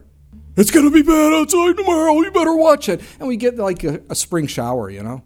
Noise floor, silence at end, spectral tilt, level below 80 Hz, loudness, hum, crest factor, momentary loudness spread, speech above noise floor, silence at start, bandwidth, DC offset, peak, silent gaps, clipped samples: -42 dBFS; 0.05 s; -4.5 dB/octave; -40 dBFS; -15 LUFS; none; 16 dB; 12 LU; 27 dB; 0.35 s; 17 kHz; under 0.1%; 0 dBFS; none; under 0.1%